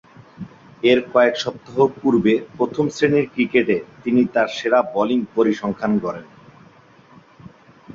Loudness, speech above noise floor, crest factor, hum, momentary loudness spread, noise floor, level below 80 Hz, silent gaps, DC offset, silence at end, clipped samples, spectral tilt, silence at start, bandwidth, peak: -19 LUFS; 30 dB; 18 dB; none; 9 LU; -49 dBFS; -58 dBFS; none; under 0.1%; 0 s; under 0.1%; -6 dB/octave; 0.4 s; 7.6 kHz; -2 dBFS